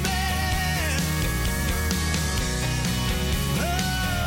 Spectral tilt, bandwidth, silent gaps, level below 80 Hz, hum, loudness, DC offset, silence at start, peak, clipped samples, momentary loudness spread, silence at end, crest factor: -4 dB/octave; 17 kHz; none; -30 dBFS; none; -25 LUFS; under 0.1%; 0 s; -8 dBFS; under 0.1%; 1 LU; 0 s; 16 dB